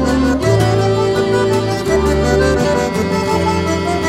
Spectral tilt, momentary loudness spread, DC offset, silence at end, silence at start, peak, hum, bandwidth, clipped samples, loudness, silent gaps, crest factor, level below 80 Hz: -6 dB/octave; 3 LU; under 0.1%; 0 s; 0 s; 0 dBFS; none; 15.5 kHz; under 0.1%; -15 LUFS; none; 14 dB; -28 dBFS